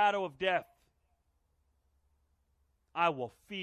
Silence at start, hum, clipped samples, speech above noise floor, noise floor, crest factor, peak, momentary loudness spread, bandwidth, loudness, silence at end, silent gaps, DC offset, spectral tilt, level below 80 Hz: 0 s; none; under 0.1%; 42 dB; -76 dBFS; 20 dB; -16 dBFS; 10 LU; 13.5 kHz; -34 LUFS; 0 s; none; under 0.1%; -5 dB/octave; -74 dBFS